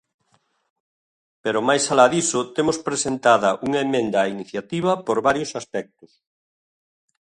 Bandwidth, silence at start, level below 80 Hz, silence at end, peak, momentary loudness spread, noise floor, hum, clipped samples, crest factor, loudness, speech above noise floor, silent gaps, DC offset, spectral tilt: 11.5 kHz; 1.45 s; -62 dBFS; 1.4 s; 0 dBFS; 12 LU; -66 dBFS; none; under 0.1%; 22 dB; -21 LUFS; 45 dB; none; under 0.1%; -3.5 dB/octave